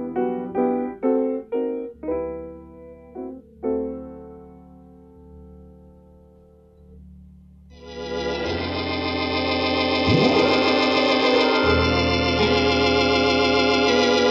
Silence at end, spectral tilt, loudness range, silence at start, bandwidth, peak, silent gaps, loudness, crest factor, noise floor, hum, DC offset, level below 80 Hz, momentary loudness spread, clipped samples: 0 s; -5 dB/octave; 16 LU; 0 s; 8 kHz; -6 dBFS; none; -20 LUFS; 16 dB; -51 dBFS; none; under 0.1%; -42 dBFS; 18 LU; under 0.1%